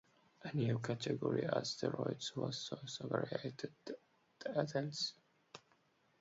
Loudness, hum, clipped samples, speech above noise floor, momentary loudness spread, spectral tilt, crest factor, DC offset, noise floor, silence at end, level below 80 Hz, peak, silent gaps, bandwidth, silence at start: -41 LUFS; none; under 0.1%; 35 dB; 14 LU; -5 dB/octave; 20 dB; under 0.1%; -75 dBFS; 0.6 s; -78 dBFS; -22 dBFS; none; 7.6 kHz; 0.4 s